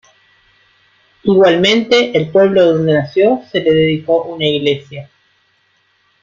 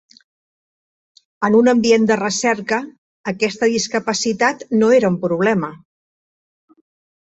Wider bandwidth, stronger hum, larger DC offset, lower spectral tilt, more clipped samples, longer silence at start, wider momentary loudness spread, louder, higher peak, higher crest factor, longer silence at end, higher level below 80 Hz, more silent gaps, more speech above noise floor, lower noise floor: about the same, 7.6 kHz vs 8.2 kHz; neither; neither; first, -6 dB/octave vs -4.5 dB/octave; neither; second, 1.25 s vs 1.4 s; about the same, 8 LU vs 9 LU; first, -13 LUFS vs -17 LUFS; about the same, 0 dBFS vs -2 dBFS; about the same, 14 dB vs 16 dB; second, 1.2 s vs 1.45 s; first, -52 dBFS vs -60 dBFS; second, none vs 2.98-3.24 s; second, 46 dB vs over 74 dB; second, -58 dBFS vs under -90 dBFS